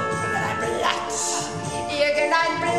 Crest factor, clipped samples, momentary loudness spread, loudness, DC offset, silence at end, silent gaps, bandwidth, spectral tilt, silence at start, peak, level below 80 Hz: 18 dB; under 0.1%; 7 LU; -23 LUFS; 0.3%; 0 s; none; 14.5 kHz; -3 dB/octave; 0 s; -6 dBFS; -52 dBFS